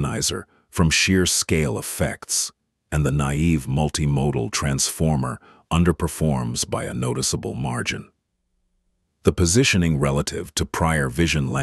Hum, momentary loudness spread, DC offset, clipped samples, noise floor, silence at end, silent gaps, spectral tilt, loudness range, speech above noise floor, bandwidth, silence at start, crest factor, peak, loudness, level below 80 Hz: none; 9 LU; under 0.1%; under 0.1%; -72 dBFS; 0 s; none; -4.5 dB/octave; 3 LU; 51 dB; 12.5 kHz; 0 s; 20 dB; -2 dBFS; -21 LUFS; -36 dBFS